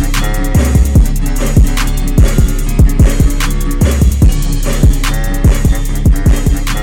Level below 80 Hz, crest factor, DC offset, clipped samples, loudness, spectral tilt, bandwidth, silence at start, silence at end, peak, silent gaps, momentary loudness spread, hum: -10 dBFS; 8 dB; under 0.1%; under 0.1%; -12 LUFS; -5.5 dB/octave; 17.5 kHz; 0 s; 0 s; 0 dBFS; none; 6 LU; none